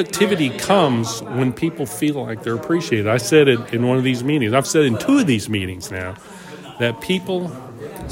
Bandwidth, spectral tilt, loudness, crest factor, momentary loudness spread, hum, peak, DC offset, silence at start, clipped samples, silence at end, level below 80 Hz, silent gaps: 16.5 kHz; -5 dB/octave; -19 LUFS; 18 dB; 15 LU; none; 0 dBFS; under 0.1%; 0 s; under 0.1%; 0 s; -52 dBFS; none